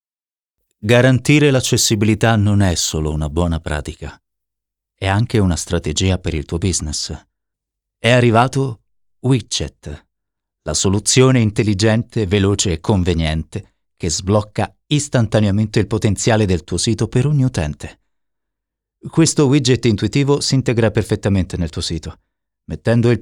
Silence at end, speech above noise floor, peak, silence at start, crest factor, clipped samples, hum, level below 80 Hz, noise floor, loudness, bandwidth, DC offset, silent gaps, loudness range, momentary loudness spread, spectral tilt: 0 s; over 74 dB; 0 dBFS; 0.85 s; 16 dB; under 0.1%; none; -36 dBFS; under -90 dBFS; -16 LUFS; 17.5 kHz; under 0.1%; none; 4 LU; 13 LU; -5 dB/octave